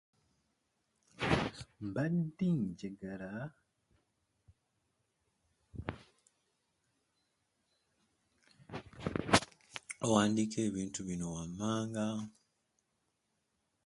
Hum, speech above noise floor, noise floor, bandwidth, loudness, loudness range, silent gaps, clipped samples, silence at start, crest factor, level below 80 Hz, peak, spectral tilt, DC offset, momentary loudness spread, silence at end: none; 46 dB; -82 dBFS; 11.5 kHz; -36 LUFS; 20 LU; none; under 0.1%; 1.2 s; 30 dB; -60 dBFS; -10 dBFS; -5 dB/octave; under 0.1%; 18 LU; 1.55 s